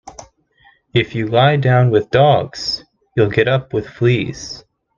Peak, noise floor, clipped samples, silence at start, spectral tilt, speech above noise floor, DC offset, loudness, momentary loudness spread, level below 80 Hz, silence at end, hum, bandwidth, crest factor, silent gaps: 0 dBFS; -53 dBFS; under 0.1%; 0.05 s; -6.5 dB/octave; 39 dB; under 0.1%; -16 LUFS; 13 LU; -48 dBFS; 0.4 s; none; 7.4 kHz; 16 dB; none